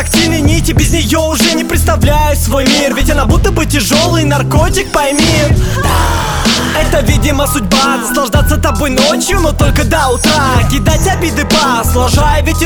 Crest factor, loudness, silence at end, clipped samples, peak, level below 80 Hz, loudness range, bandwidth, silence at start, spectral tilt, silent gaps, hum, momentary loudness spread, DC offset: 10 dB; -10 LUFS; 0 s; under 0.1%; 0 dBFS; -16 dBFS; 1 LU; over 20 kHz; 0 s; -4.5 dB/octave; none; none; 2 LU; under 0.1%